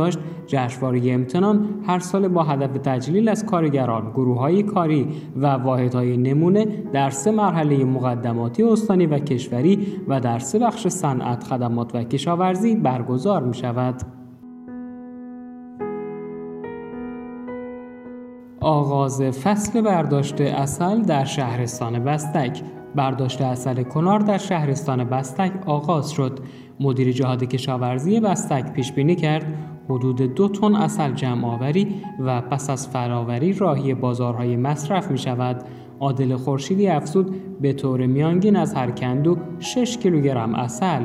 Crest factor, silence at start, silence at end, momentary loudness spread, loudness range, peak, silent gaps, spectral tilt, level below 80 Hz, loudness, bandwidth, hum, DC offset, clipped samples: 16 dB; 0 s; 0 s; 14 LU; 5 LU; -6 dBFS; none; -7 dB/octave; -58 dBFS; -21 LUFS; 13.5 kHz; none; under 0.1%; under 0.1%